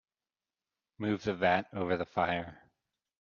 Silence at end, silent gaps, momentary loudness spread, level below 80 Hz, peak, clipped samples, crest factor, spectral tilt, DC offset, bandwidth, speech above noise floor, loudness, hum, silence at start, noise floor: 0.65 s; none; 8 LU; -68 dBFS; -14 dBFS; under 0.1%; 22 dB; -4 dB/octave; under 0.1%; 7.2 kHz; over 58 dB; -32 LUFS; none; 1 s; under -90 dBFS